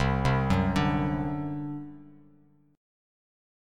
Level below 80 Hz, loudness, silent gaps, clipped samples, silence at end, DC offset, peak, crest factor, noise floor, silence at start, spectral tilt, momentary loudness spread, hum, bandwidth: -42 dBFS; -28 LUFS; none; under 0.1%; 1 s; under 0.1%; -12 dBFS; 18 dB; -61 dBFS; 0 s; -7.5 dB/octave; 13 LU; none; 11 kHz